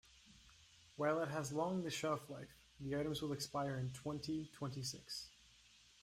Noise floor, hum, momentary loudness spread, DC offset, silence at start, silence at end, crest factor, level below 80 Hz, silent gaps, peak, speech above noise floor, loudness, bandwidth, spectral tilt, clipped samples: -67 dBFS; none; 22 LU; under 0.1%; 0.15 s; 0.25 s; 18 dB; -70 dBFS; none; -26 dBFS; 25 dB; -43 LUFS; 16 kHz; -5 dB/octave; under 0.1%